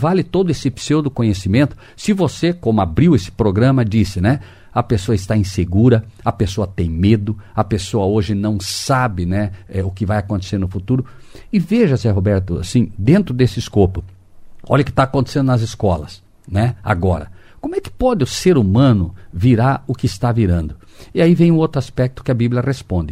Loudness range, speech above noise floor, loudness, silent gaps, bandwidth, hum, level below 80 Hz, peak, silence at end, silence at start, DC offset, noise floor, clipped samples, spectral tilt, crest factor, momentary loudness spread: 3 LU; 21 dB; -17 LUFS; none; 14 kHz; none; -36 dBFS; 0 dBFS; 0 s; 0 s; under 0.1%; -37 dBFS; under 0.1%; -7 dB/octave; 16 dB; 8 LU